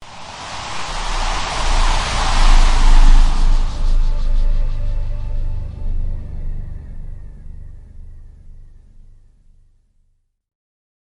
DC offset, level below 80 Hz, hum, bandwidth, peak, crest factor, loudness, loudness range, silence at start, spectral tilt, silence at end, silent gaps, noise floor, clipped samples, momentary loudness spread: under 0.1%; -16 dBFS; none; 10.5 kHz; 0 dBFS; 16 dB; -21 LUFS; 18 LU; 0 s; -3.5 dB/octave; 2.55 s; none; -61 dBFS; under 0.1%; 22 LU